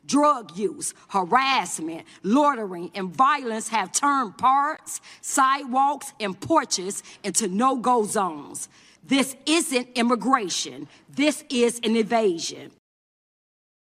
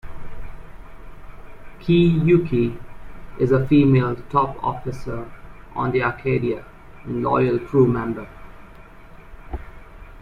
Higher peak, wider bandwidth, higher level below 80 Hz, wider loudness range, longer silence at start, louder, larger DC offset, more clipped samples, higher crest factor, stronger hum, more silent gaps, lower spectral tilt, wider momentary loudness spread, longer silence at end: about the same, -4 dBFS vs -4 dBFS; first, 16 kHz vs 6.8 kHz; second, -70 dBFS vs -40 dBFS; second, 2 LU vs 5 LU; about the same, 0.1 s vs 0.05 s; second, -23 LUFS vs -20 LUFS; neither; neither; about the same, 18 dB vs 18 dB; neither; neither; second, -3 dB/octave vs -9.5 dB/octave; second, 12 LU vs 24 LU; first, 1.15 s vs 0 s